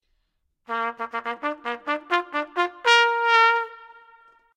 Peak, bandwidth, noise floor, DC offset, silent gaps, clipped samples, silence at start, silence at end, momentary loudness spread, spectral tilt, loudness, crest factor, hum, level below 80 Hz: -2 dBFS; 12 kHz; -73 dBFS; under 0.1%; none; under 0.1%; 0.7 s; 0.65 s; 13 LU; -0.5 dB/octave; -22 LUFS; 22 dB; none; -76 dBFS